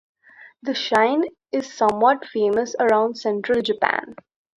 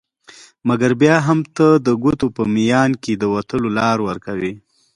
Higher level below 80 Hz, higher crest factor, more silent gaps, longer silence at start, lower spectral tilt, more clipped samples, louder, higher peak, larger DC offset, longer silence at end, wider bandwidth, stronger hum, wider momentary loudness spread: second, -64 dBFS vs -50 dBFS; about the same, 20 dB vs 18 dB; neither; second, 0.4 s vs 0.65 s; second, -4 dB/octave vs -6.5 dB/octave; neither; second, -21 LUFS vs -17 LUFS; about the same, -2 dBFS vs 0 dBFS; neither; about the same, 0.45 s vs 0.4 s; about the same, 11 kHz vs 11 kHz; neither; about the same, 9 LU vs 10 LU